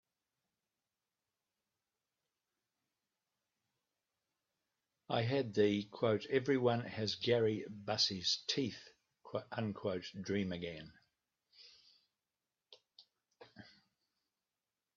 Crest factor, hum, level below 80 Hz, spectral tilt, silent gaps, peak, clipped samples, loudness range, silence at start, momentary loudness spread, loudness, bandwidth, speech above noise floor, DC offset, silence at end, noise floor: 22 dB; none; -78 dBFS; -5 dB/octave; none; -20 dBFS; under 0.1%; 11 LU; 5.1 s; 12 LU; -37 LUFS; 7.6 kHz; over 53 dB; under 0.1%; 1.35 s; under -90 dBFS